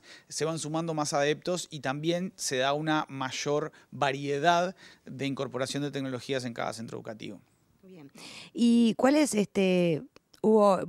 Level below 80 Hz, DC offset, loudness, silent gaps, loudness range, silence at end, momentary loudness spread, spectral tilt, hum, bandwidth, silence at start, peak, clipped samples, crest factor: -72 dBFS; under 0.1%; -29 LUFS; none; 8 LU; 0 s; 17 LU; -5 dB/octave; none; 13.5 kHz; 0.1 s; -8 dBFS; under 0.1%; 22 dB